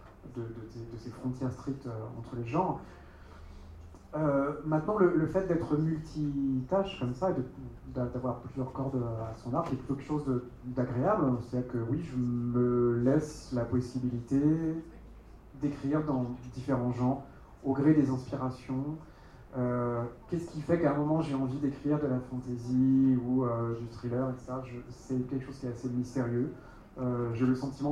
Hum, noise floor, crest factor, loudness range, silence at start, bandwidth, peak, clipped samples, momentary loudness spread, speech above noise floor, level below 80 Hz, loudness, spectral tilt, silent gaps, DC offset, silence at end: none; -51 dBFS; 18 dB; 5 LU; 0 s; 10 kHz; -12 dBFS; under 0.1%; 14 LU; 20 dB; -54 dBFS; -32 LUFS; -9 dB/octave; none; under 0.1%; 0 s